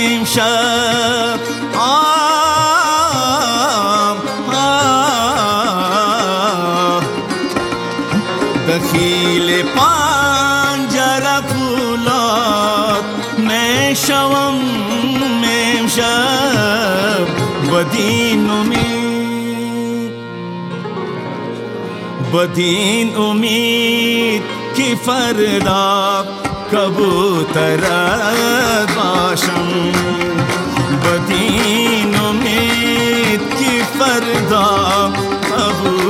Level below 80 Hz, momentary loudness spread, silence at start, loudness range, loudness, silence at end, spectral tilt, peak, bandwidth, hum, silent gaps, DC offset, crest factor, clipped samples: -46 dBFS; 7 LU; 0 s; 3 LU; -14 LUFS; 0 s; -3.5 dB/octave; 0 dBFS; 17 kHz; none; none; under 0.1%; 14 dB; under 0.1%